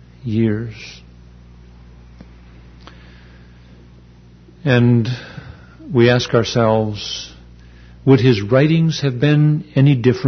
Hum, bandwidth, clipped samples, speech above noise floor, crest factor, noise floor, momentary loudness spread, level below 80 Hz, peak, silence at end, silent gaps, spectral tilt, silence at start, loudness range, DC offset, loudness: 60 Hz at -35 dBFS; 6.6 kHz; under 0.1%; 29 dB; 16 dB; -44 dBFS; 16 LU; -44 dBFS; -2 dBFS; 0 s; none; -7 dB/octave; 0.25 s; 11 LU; under 0.1%; -16 LUFS